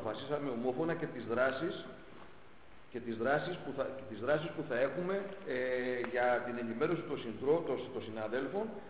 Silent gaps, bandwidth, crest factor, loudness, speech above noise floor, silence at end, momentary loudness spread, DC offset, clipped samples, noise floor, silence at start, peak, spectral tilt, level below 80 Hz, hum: none; 4 kHz; 18 dB; -36 LUFS; 23 dB; 0 s; 9 LU; 0.2%; under 0.1%; -59 dBFS; 0 s; -18 dBFS; -4.5 dB/octave; -68 dBFS; none